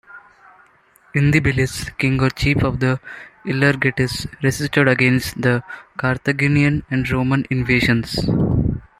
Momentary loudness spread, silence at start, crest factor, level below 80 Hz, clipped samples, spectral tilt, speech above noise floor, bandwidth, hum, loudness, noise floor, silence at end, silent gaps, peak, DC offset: 7 LU; 0.15 s; 16 dB; -38 dBFS; under 0.1%; -6 dB/octave; 36 dB; 15 kHz; none; -18 LUFS; -54 dBFS; 0.2 s; none; -2 dBFS; under 0.1%